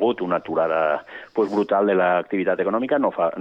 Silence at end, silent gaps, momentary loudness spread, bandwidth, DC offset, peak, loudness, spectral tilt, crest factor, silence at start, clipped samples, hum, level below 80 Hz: 0 s; none; 6 LU; 7.4 kHz; under 0.1%; -8 dBFS; -22 LUFS; -8 dB/octave; 14 dB; 0 s; under 0.1%; none; -68 dBFS